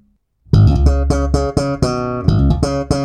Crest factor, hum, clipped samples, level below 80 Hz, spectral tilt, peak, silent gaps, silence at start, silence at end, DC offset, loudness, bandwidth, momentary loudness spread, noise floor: 14 dB; none; under 0.1%; -20 dBFS; -7.5 dB/octave; -2 dBFS; none; 0.5 s; 0 s; under 0.1%; -15 LUFS; 10.5 kHz; 6 LU; -52 dBFS